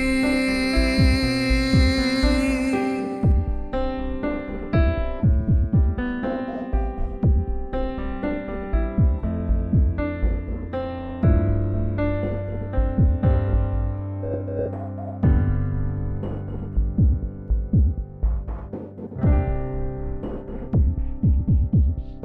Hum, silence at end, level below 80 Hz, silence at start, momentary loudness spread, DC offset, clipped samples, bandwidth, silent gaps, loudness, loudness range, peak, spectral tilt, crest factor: none; 0 s; -26 dBFS; 0 s; 10 LU; under 0.1%; under 0.1%; 11 kHz; none; -23 LUFS; 4 LU; -6 dBFS; -7.5 dB/octave; 14 dB